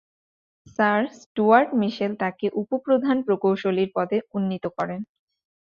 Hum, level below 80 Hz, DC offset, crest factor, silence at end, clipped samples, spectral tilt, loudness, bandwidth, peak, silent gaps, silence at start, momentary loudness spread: none; -68 dBFS; under 0.1%; 20 dB; 0.6 s; under 0.1%; -7.5 dB/octave; -23 LUFS; 7.2 kHz; -2 dBFS; 1.26-1.35 s; 0.8 s; 11 LU